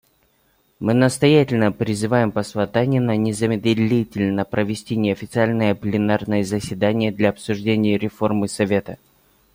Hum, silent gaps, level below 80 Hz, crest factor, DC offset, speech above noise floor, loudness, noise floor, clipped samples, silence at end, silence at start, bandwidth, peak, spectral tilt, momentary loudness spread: none; none; -54 dBFS; 18 dB; under 0.1%; 43 dB; -20 LUFS; -62 dBFS; under 0.1%; 0.6 s; 0.8 s; 16.5 kHz; -2 dBFS; -6.5 dB/octave; 7 LU